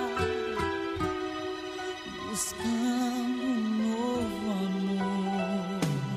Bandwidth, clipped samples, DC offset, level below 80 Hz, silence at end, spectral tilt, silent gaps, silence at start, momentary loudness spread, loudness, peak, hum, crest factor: 15.5 kHz; under 0.1%; under 0.1%; -54 dBFS; 0 s; -5 dB/octave; none; 0 s; 7 LU; -31 LUFS; -16 dBFS; none; 14 dB